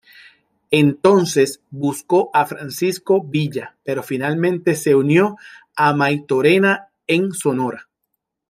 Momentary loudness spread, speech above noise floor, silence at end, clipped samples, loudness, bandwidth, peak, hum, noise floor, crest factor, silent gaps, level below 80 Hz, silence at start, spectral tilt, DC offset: 10 LU; 58 dB; 0.65 s; under 0.1%; -18 LUFS; 15.5 kHz; 0 dBFS; none; -76 dBFS; 18 dB; none; -64 dBFS; 0.7 s; -5.5 dB/octave; under 0.1%